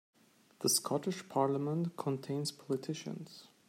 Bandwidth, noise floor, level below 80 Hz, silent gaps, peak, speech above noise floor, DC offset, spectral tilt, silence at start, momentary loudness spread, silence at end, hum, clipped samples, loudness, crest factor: 16 kHz; -61 dBFS; -82 dBFS; none; -18 dBFS; 25 dB; under 0.1%; -4.5 dB/octave; 0.6 s; 11 LU; 0.2 s; none; under 0.1%; -35 LUFS; 20 dB